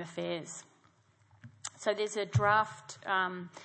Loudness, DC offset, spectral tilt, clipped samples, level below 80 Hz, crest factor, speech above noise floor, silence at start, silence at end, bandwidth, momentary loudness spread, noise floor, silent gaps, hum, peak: -32 LUFS; under 0.1%; -4.5 dB/octave; under 0.1%; -68 dBFS; 20 dB; 34 dB; 0 s; 0 s; 8.8 kHz; 17 LU; -67 dBFS; none; none; -14 dBFS